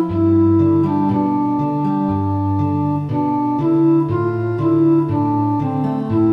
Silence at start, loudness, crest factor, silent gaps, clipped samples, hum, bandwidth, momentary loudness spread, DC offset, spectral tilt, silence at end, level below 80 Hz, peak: 0 s; -17 LUFS; 12 dB; none; under 0.1%; none; 4.8 kHz; 5 LU; under 0.1%; -11 dB/octave; 0 s; -48 dBFS; -4 dBFS